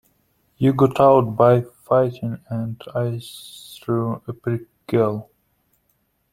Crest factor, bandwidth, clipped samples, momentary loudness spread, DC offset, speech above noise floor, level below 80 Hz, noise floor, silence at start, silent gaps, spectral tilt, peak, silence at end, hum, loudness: 20 dB; 15.5 kHz; under 0.1%; 17 LU; under 0.1%; 48 dB; -56 dBFS; -68 dBFS; 0.6 s; none; -8 dB/octave; -2 dBFS; 1.1 s; none; -20 LUFS